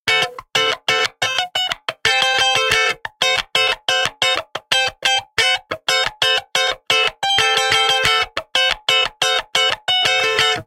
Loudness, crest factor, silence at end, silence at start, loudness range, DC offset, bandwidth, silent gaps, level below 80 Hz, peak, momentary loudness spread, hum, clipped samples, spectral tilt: -16 LUFS; 18 dB; 0.05 s; 0.05 s; 2 LU; under 0.1%; 17 kHz; none; -50 dBFS; 0 dBFS; 5 LU; none; under 0.1%; 0 dB/octave